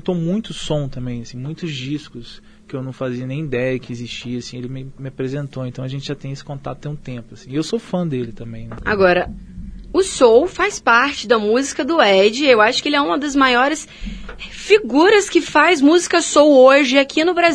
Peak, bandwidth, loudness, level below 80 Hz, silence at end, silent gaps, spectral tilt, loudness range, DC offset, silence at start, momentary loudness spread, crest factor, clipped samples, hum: 0 dBFS; 10.5 kHz; -16 LUFS; -42 dBFS; 0 s; none; -4.5 dB/octave; 13 LU; under 0.1%; 0 s; 18 LU; 16 dB; under 0.1%; none